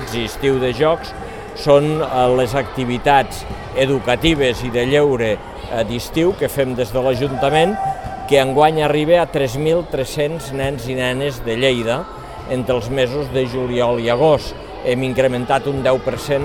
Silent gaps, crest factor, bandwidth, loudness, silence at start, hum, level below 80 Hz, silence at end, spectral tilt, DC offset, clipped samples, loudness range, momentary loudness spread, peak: none; 16 dB; 18 kHz; -17 LUFS; 0 s; none; -36 dBFS; 0 s; -5.5 dB/octave; 0.3%; under 0.1%; 3 LU; 9 LU; 0 dBFS